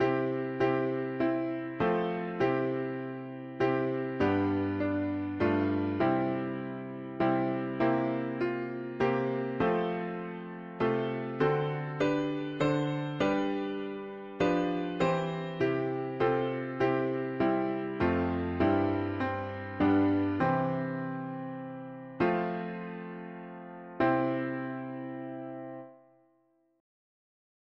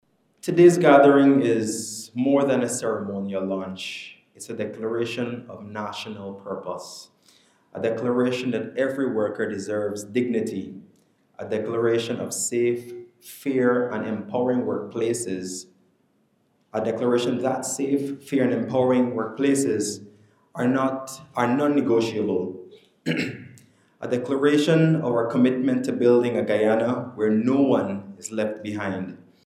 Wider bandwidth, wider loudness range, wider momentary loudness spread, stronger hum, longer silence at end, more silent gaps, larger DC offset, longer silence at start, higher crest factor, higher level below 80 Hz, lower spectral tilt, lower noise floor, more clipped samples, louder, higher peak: second, 7.4 kHz vs 14.5 kHz; second, 5 LU vs 8 LU; second, 12 LU vs 15 LU; neither; first, 1.85 s vs 0.3 s; neither; neither; second, 0 s vs 0.45 s; second, 16 dB vs 22 dB; first, -60 dBFS vs -74 dBFS; first, -8 dB/octave vs -5.5 dB/octave; first, -71 dBFS vs -66 dBFS; neither; second, -31 LUFS vs -23 LUFS; second, -14 dBFS vs -2 dBFS